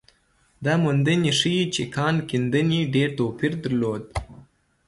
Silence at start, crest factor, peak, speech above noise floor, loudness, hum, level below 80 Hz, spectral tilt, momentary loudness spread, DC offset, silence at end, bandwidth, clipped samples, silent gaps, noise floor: 0.6 s; 16 dB; -8 dBFS; 41 dB; -23 LUFS; none; -48 dBFS; -5.5 dB/octave; 8 LU; under 0.1%; 0.45 s; 11.5 kHz; under 0.1%; none; -63 dBFS